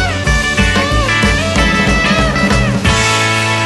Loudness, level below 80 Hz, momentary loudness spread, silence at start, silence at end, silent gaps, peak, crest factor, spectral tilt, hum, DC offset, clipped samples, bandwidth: -11 LUFS; -20 dBFS; 2 LU; 0 s; 0 s; none; 0 dBFS; 12 dB; -4 dB/octave; none; under 0.1%; under 0.1%; 12.5 kHz